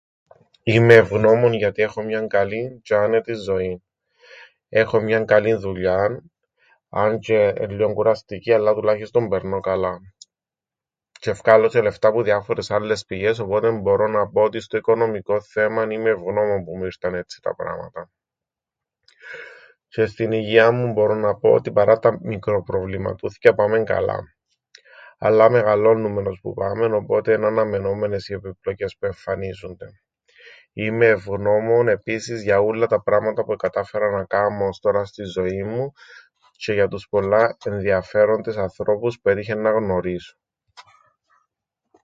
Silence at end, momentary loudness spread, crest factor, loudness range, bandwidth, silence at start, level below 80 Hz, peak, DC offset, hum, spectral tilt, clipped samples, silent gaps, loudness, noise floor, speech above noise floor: 1.2 s; 12 LU; 20 dB; 6 LU; 7.8 kHz; 0.65 s; -50 dBFS; 0 dBFS; under 0.1%; none; -7 dB/octave; under 0.1%; none; -20 LUFS; -89 dBFS; 70 dB